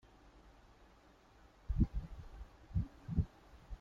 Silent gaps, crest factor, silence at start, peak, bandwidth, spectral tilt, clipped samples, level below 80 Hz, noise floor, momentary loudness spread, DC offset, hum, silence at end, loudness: none; 24 dB; 0.25 s; -18 dBFS; 7.2 kHz; -9.5 dB/octave; under 0.1%; -46 dBFS; -65 dBFS; 26 LU; under 0.1%; none; 0.05 s; -41 LUFS